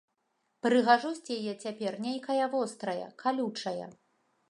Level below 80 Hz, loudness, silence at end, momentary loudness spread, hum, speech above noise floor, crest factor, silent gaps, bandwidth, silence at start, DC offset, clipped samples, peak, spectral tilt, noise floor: -84 dBFS; -31 LUFS; 0.6 s; 11 LU; none; 48 dB; 22 dB; none; 11 kHz; 0.65 s; under 0.1%; under 0.1%; -10 dBFS; -4.5 dB/octave; -78 dBFS